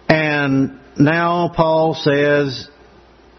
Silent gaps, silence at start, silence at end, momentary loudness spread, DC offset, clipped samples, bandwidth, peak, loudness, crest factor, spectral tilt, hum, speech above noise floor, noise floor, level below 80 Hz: none; 0.1 s; 0.7 s; 7 LU; under 0.1%; under 0.1%; 6.4 kHz; 0 dBFS; -16 LUFS; 16 dB; -7 dB/octave; none; 31 dB; -47 dBFS; -46 dBFS